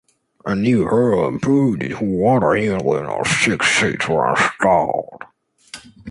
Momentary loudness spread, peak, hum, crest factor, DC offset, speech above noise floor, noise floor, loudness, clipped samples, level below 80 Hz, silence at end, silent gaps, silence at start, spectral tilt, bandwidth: 15 LU; -2 dBFS; none; 16 dB; under 0.1%; 24 dB; -41 dBFS; -17 LUFS; under 0.1%; -48 dBFS; 0 s; none; 0.45 s; -5 dB/octave; 11.5 kHz